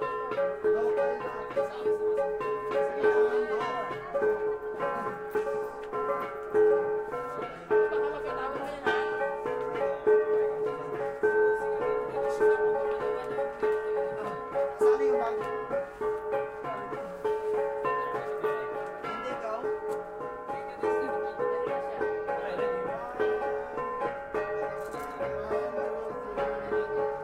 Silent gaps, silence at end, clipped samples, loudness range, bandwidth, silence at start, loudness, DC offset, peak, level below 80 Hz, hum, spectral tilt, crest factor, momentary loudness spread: none; 0 s; under 0.1%; 4 LU; 10.5 kHz; 0 s; -30 LUFS; under 0.1%; -12 dBFS; -60 dBFS; none; -5.5 dB/octave; 18 dB; 9 LU